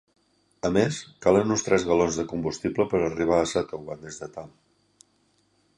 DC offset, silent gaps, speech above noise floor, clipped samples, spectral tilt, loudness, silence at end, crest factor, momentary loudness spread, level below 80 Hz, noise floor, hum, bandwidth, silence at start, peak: under 0.1%; none; 42 dB; under 0.1%; -5 dB/octave; -25 LUFS; 1.3 s; 20 dB; 16 LU; -52 dBFS; -67 dBFS; 50 Hz at -60 dBFS; 11 kHz; 0.65 s; -6 dBFS